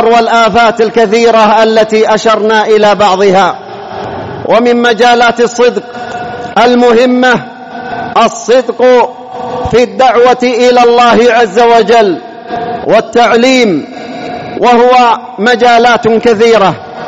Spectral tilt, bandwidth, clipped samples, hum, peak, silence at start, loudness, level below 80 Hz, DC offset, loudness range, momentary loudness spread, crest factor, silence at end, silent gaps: -4.5 dB/octave; 8 kHz; 1%; none; 0 dBFS; 0 s; -7 LUFS; -42 dBFS; 0.4%; 3 LU; 14 LU; 8 dB; 0 s; none